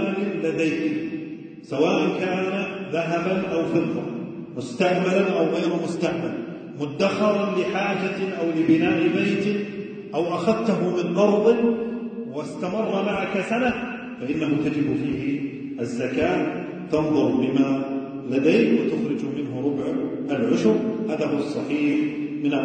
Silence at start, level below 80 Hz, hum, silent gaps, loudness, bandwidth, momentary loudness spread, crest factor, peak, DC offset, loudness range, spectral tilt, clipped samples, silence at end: 0 s; -60 dBFS; none; none; -23 LUFS; 9.2 kHz; 11 LU; 16 dB; -6 dBFS; under 0.1%; 3 LU; -6.5 dB/octave; under 0.1%; 0 s